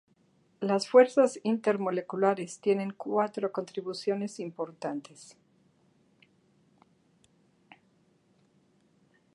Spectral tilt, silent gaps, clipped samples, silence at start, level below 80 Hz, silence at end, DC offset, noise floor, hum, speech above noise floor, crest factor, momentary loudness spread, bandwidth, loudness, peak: -5.5 dB/octave; none; under 0.1%; 0.6 s; -86 dBFS; 4.1 s; under 0.1%; -67 dBFS; none; 39 dB; 24 dB; 15 LU; 11 kHz; -29 LUFS; -8 dBFS